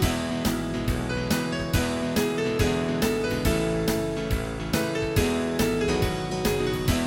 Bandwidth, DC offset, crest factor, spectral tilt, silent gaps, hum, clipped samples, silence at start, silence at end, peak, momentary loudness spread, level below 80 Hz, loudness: 17 kHz; under 0.1%; 18 dB; -5 dB/octave; none; none; under 0.1%; 0 s; 0 s; -8 dBFS; 3 LU; -36 dBFS; -26 LUFS